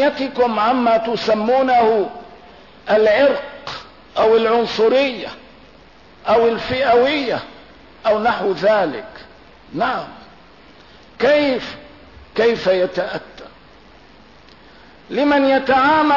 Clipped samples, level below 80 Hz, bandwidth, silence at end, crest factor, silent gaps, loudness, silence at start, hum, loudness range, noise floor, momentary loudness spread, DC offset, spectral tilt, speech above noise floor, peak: under 0.1%; -52 dBFS; 6 kHz; 0 s; 12 dB; none; -17 LUFS; 0 s; none; 5 LU; -46 dBFS; 17 LU; 0.2%; -5.5 dB/octave; 30 dB; -6 dBFS